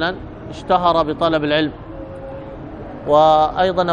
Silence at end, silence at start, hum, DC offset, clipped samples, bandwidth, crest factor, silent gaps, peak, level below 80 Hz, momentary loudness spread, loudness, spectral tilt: 0 s; 0 s; none; under 0.1%; under 0.1%; 9.4 kHz; 16 dB; none; -2 dBFS; -40 dBFS; 19 LU; -16 LUFS; -6.5 dB/octave